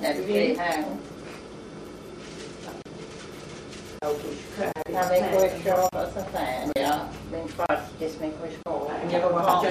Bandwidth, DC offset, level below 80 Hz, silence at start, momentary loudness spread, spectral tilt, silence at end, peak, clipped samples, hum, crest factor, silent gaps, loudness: 15.5 kHz; under 0.1%; -54 dBFS; 0 s; 17 LU; -5 dB/octave; 0 s; -8 dBFS; under 0.1%; none; 20 dB; none; -27 LUFS